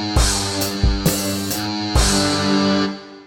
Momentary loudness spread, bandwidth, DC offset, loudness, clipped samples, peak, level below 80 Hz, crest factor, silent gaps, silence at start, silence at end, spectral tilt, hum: 6 LU; 17.5 kHz; under 0.1%; -18 LUFS; under 0.1%; -4 dBFS; -24 dBFS; 16 dB; none; 0 s; 0.05 s; -4 dB/octave; none